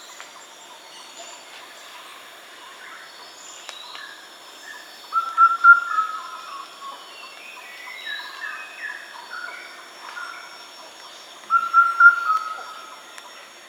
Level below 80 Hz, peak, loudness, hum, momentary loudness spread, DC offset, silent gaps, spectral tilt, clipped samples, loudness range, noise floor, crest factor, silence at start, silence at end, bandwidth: -90 dBFS; -2 dBFS; -18 LUFS; none; 26 LU; under 0.1%; none; 1.5 dB/octave; under 0.1%; 19 LU; -43 dBFS; 22 dB; 0 s; 0.25 s; 16 kHz